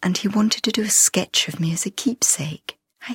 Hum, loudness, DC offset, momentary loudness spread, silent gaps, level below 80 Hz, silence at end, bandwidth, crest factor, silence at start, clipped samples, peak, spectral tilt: none; -19 LUFS; under 0.1%; 16 LU; none; -62 dBFS; 0 s; 16.5 kHz; 18 dB; 0 s; under 0.1%; -2 dBFS; -2.5 dB/octave